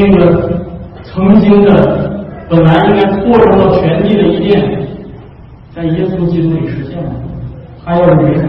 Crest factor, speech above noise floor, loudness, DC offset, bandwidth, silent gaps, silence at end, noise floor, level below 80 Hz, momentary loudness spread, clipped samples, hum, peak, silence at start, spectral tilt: 10 dB; 25 dB; -10 LUFS; under 0.1%; 5.6 kHz; none; 0 s; -33 dBFS; -30 dBFS; 18 LU; 0.3%; none; 0 dBFS; 0 s; -10.5 dB/octave